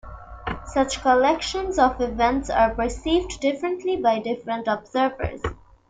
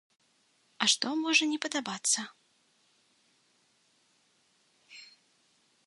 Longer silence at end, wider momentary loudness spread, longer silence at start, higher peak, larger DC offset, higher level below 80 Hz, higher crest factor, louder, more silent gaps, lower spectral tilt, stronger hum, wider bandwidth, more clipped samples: second, 0.35 s vs 0.8 s; second, 12 LU vs 25 LU; second, 0.05 s vs 0.8 s; first, -6 dBFS vs -12 dBFS; neither; first, -40 dBFS vs -86 dBFS; second, 18 dB vs 24 dB; first, -23 LUFS vs -28 LUFS; neither; first, -4.5 dB/octave vs -0.5 dB/octave; neither; second, 9.6 kHz vs 11.5 kHz; neither